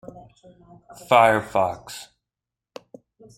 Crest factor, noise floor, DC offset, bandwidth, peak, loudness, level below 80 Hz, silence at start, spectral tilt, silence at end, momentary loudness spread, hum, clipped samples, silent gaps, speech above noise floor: 24 dB; -88 dBFS; under 0.1%; 16 kHz; -2 dBFS; -19 LUFS; -60 dBFS; 0.15 s; -4.5 dB/octave; 1.35 s; 22 LU; none; under 0.1%; none; 67 dB